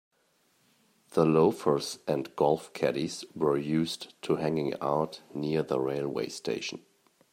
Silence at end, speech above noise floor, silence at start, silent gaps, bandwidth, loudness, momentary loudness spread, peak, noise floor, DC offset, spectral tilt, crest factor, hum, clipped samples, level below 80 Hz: 0.55 s; 41 dB; 1.15 s; none; 16 kHz; -30 LUFS; 10 LU; -10 dBFS; -70 dBFS; under 0.1%; -6 dB/octave; 20 dB; none; under 0.1%; -68 dBFS